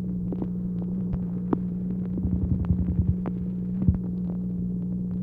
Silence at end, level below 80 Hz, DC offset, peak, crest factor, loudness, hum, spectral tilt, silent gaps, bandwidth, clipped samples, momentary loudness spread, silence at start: 0 s; -36 dBFS; under 0.1%; -6 dBFS; 20 dB; -28 LUFS; 60 Hz at -35 dBFS; -13 dB/octave; none; 2.6 kHz; under 0.1%; 4 LU; 0 s